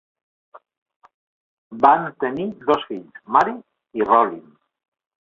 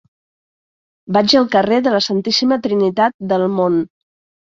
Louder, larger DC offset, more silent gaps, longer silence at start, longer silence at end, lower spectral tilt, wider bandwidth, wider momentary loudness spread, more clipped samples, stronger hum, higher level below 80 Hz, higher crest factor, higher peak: second, -19 LUFS vs -15 LUFS; neither; first, 0.78-0.86 s, 0.96-1.00 s, 1.14-1.71 s vs 3.14-3.19 s; second, 0.55 s vs 1.1 s; about the same, 0.85 s vs 0.75 s; first, -6.5 dB/octave vs -5 dB/octave; about the same, 7.4 kHz vs 7.6 kHz; first, 18 LU vs 6 LU; neither; neither; second, -64 dBFS vs -58 dBFS; first, 22 dB vs 16 dB; about the same, 0 dBFS vs 0 dBFS